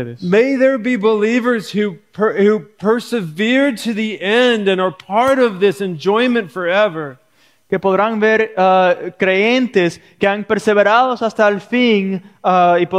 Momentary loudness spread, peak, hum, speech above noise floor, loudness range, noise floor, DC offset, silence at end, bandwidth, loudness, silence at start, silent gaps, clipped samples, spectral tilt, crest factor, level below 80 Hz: 8 LU; -2 dBFS; none; 41 dB; 2 LU; -56 dBFS; under 0.1%; 0 s; 14.5 kHz; -15 LUFS; 0 s; none; under 0.1%; -5.5 dB/octave; 14 dB; -62 dBFS